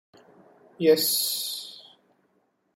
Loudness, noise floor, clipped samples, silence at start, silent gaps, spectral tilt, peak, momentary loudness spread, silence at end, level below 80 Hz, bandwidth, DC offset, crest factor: -24 LUFS; -70 dBFS; under 0.1%; 0.8 s; none; -2.5 dB/octave; -8 dBFS; 20 LU; 0.95 s; -80 dBFS; 16.5 kHz; under 0.1%; 22 dB